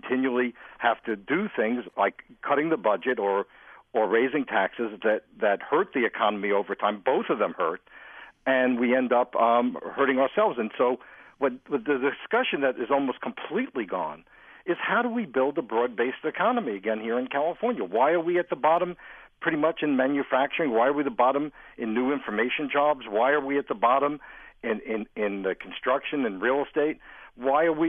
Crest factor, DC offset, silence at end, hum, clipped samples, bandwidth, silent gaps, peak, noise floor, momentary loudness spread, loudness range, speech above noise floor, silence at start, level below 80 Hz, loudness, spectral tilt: 18 dB; under 0.1%; 0 s; none; under 0.1%; 3.7 kHz; none; -8 dBFS; -47 dBFS; 8 LU; 3 LU; 21 dB; 0.05 s; -66 dBFS; -26 LUFS; -8.5 dB/octave